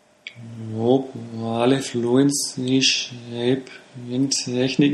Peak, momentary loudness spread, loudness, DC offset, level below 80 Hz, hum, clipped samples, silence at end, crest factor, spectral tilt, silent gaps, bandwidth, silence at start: -4 dBFS; 18 LU; -21 LUFS; under 0.1%; -64 dBFS; none; under 0.1%; 0 s; 18 dB; -4 dB/octave; none; 14 kHz; 0.25 s